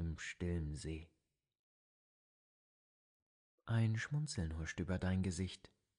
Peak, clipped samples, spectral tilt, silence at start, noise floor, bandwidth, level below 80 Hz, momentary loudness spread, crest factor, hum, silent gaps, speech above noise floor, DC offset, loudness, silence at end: -24 dBFS; under 0.1%; -6 dB/octave; 0 s; under -90 dBFS; 10.5 kHz; -56 dBFS; 10 LU; 18 dB; none; 1.59-3.58 s; over 50 dB; under 0.1%; -41 LUFS; 0.4 s